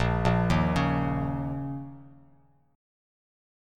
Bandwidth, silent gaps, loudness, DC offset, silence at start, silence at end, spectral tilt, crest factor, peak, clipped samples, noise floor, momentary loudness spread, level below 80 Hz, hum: 10.5 kHz; none; -27 LUFS; under 0.1%; 0 s; 1.6 s; -7.5 dB/octave; 20 dB; -10 dBFS; under 0.1%; -62 dBFS; 13 LU; -40 dBFS; none